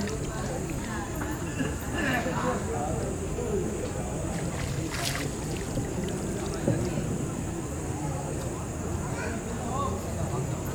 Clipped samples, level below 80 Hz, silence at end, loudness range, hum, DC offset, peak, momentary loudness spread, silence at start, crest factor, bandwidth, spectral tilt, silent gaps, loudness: under 0.1%; -40 dBFS; 0 s; 2 LU; none; under 0.1%; -12 dBFS; 4 LU; 0 s; 20 dB; over 20 kHz; -5 dB/octave; none; -31 LUFS